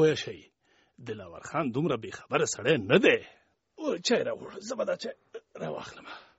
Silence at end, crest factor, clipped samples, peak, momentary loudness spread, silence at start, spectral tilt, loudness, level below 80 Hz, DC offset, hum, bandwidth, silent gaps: 0.15 s; 22 dB; under 0.1%; -8 dBFS; 19 LU; 0 s; -3.5 dB/octave; -29 LUFS; -68 dBFS; under 0.1%; none; 8 kHz; none